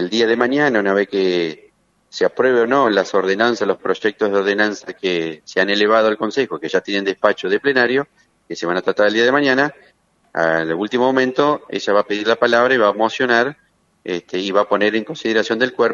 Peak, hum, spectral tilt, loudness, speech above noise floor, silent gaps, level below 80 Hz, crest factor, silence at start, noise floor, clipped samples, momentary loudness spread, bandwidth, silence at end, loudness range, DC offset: 0 dBFS; none; -4.5 dB/octave; -17 LUFS; 35 dB; none; -66 dBFS; 18 dB; 0 s; -52 dBFS; under 0.1%; 8 LU; 7.6 kHz; 0 s; 1 LU; under 0.1%